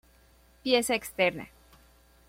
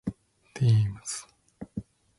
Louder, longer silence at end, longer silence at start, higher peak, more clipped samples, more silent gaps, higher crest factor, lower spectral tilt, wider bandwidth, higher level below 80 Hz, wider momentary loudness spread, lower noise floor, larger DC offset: about the same, -28 LUFS vs -28 LUFS; first, 0.8 s vs 0.35 s; first, 0.65 s vs 0.05 s; first, -10 dBFS vs -14 dBFS; neither; neither; first, 22 dB vs 16 dB; second, -3 dB/octave vs -6 dB/octave; first, 16.5 kHz vs 11.5 kHz; second, -60 dBFS vs -54 dBFS; second, 18 LU vs 21 LU; first, -60 dBFS vs -48 dBFS; neither